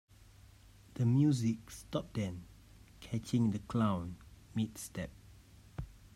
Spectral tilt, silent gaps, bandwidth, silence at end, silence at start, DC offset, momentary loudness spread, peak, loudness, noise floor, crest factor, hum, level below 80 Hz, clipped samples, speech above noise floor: -7 dB/octave; none; 15.5 kHz; 0.1 s; 0.95 s; under 0.1%; 19 LU; -20 dBFS; -35 LUFS; -59 dBFS; 18 dB; none; -58 dBFS; under 0.1%; 25 dB